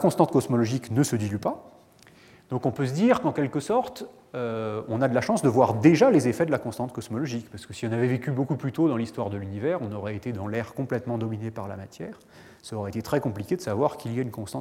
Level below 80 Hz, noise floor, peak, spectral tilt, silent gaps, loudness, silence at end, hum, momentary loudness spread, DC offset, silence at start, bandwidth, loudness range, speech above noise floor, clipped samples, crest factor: -64 dBFS; -54 dBFS; -4 dBFS; -7 dB/octave; none; -26 LUFS; 0 s; none; 14 LU; under 0.1%; 0 s; 16.5 kHz; 8 LU; 28 dB; under 0.1%; 22 dB